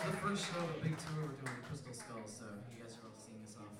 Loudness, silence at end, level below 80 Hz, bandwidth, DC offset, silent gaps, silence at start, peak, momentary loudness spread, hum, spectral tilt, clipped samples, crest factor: -44 LUFS; 0 s; -72 dBFS; 15.5 kHz; under 0.1%; none; 0 s; -24 dBFS; 15 LU; none; -5 dB/octave; under 0.1%; 18 dB